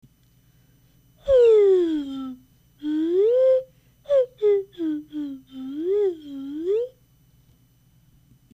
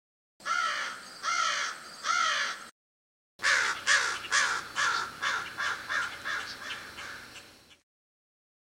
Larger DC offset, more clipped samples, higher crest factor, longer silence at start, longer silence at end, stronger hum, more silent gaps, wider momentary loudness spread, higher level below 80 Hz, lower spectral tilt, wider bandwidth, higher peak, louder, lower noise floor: neither; neither; second, 14 dB vs 22 dB; first, 1.25 s vs 0.4 s; first, 1.65 s vs 0.9 s; neither; second, none vs 2.71-3.39 s; first, 18 LU vs 15 LU; first, -56 dBFS vs -70 dBFS; first, -7 dB/octave vs 1 dB/octave; second, 8 kHz vs 16 kHz; about the same, -10 dBFS vs -10 dBFS; first, -22 LUFS vs -29 LUFS; first, -59 dBFS vs -52 dBFS